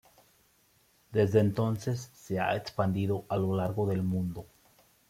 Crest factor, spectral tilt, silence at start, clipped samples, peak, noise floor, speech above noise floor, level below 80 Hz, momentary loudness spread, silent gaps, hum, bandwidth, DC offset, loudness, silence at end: 20 dB; -7.5 dB/octave; 1.1 s; under 0.1%; -12 dBFS; -67 dBFS; 38 dB; -62 dBFS; 10 LU; none; none; 16 kHz; under 0.1%; -30 LUFS; 0.65 s